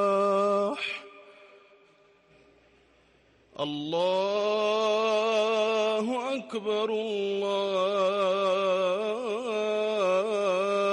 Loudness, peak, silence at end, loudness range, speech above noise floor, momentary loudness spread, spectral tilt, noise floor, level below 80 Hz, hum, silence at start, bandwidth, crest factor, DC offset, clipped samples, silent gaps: -27 LUFS; -16 dBFS; 0 s; 8 LU; 35 dB; 7 LU; -4.5 dB/octave; -62 dBFS; -78 dBFS; none; 0 s; 11.5 kHz; 12 dB; under 0.1%; under 0.1%; none